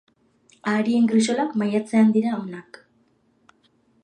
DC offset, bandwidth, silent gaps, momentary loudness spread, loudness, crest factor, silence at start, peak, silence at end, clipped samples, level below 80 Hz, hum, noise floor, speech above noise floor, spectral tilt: under 0.1%; 9.8 kHz; none; 13 LU; -21 LUFS; 16 dB; 0.65 s; -6 dBFS; 1.4 s; under 0.1%; -74 dBFS; none; -63 dBFS; 43 dB; -5.5 dB/octave